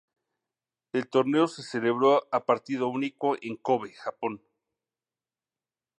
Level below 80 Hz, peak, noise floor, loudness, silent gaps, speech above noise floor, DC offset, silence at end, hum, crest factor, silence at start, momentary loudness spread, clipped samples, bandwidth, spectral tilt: -80 dBFS; -8 dBFS; under -90 dBFS; -27 LUFS; none; over 63 dB; under 0.1%; 1.65 s; none; 20 dB; 0.95 s; 11 LU; under 0.1%; 10.5 kHz; -6 dB/octave